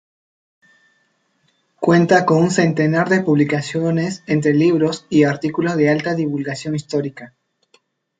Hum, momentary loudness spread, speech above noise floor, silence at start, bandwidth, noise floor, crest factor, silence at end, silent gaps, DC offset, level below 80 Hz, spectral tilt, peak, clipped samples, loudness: none; 9 LU; 48 dB; 1.8 s; 9.2 kHz; -64 dBFS; 16 dB; 0.95 s; none; under 0.1%; -60 dBFS; -6.5 dB/octave; -2 dBFS; under 0.1%; -17 LUFS